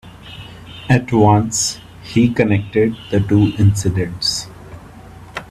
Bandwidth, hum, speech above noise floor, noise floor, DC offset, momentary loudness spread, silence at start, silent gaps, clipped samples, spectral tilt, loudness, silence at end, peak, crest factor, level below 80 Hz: 14 kHz; none; 23 dB; -38 dBFS; under 0.1%; 22 LU; 0.05 s; none; under 0.1%; -5.5 dB/octave; -16 LUFS; 0.05 s; 0 dBFS; 16 dB; -42 dBFS